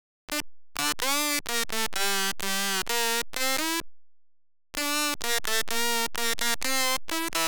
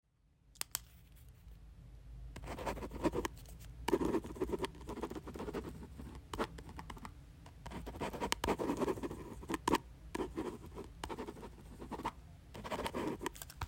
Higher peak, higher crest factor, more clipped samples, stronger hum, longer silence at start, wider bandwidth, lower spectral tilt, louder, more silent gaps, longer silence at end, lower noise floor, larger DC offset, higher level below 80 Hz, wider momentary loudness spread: about the same, -8 dBFS vs -10 dBFS; second, 20 dB vs 32 dB; neither; neither; second, 0.3 s vs 0.45 s; first, over 20 kHz vs 16 kHz; second, -0.5 dB/octave vs -4.5 dB/octave; first, -27 LUFS vs -42 LUFS; neither; about the same, 0 s vs 0 s; second, -59 dBFS vs -69 dBFS; first, 2% vs under 0.1%; about the same, -54 dBFS vs -54 dBFS; second, 6 LU vs 19 LU